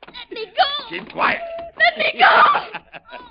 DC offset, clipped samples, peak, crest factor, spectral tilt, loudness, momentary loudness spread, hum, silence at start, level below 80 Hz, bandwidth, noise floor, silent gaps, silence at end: under 0.1%; under 0.1%; -2 dBFS; 18 dB; -7 dB/octave; -16 LUFS; 21 LU; none; 0.15 s; -58 dBFS; 5.4 kHz; -39 dBFS; none; 0.05 s